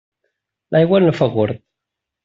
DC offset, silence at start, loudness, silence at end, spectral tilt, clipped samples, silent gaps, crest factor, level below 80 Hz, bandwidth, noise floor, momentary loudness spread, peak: under 0.1%; 0.7 s; -16 LUFS; 0.7 s; -6.5 dB/octave; under 0.1%; none; 16 dB; -56 dBFS; 7.4 kHz; -82 dBFS; 9 LU; -2 dBFS